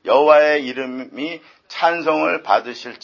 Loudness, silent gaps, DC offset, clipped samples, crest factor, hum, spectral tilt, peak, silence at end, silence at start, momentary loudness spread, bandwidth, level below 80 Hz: -17 LUFS; none; under 0.1%; under 0.1%; 16 dB; none; -4.5 dB/octave; 0 dBFS; 0.05 s; 0.05 s; 17 LU; 7.2 kHz; -68 dBFS